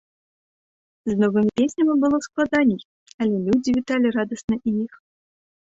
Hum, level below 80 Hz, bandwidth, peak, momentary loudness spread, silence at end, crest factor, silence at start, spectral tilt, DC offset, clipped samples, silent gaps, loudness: none; -56 dBFS; 8 kHz; -6 dBFS; 7 LU; 0.9 s; 16 dB; 1.05 s; -6.5 dB/octave; under 0.1%; under 0.1%; 2.85-3.06 s, 3.14-3.18 s, 4.44-4.48 s; -21 LUFS